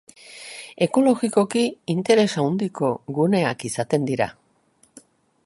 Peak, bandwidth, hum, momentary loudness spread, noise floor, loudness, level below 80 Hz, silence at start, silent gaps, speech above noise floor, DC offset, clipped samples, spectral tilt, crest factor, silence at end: -4 dBFS; 11.5 kHz; none; 16 LU; -61 dBFS; -22 LUFS; -64 dBFS; 0.3 s; none; 40 dB; under 0.1%; under 0.1%; -5.5 dB/octave; 18 dB; 1.15 s